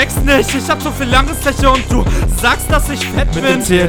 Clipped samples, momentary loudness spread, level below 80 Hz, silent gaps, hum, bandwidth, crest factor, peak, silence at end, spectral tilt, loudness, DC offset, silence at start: 0.4%; 4 LU; -18 dBFS; none; none; 18.5 kHz; 12 dB; 0 dBFS; 0 s; -4.5 dB/octave; -13 LUFS; under 0.1%; 0 s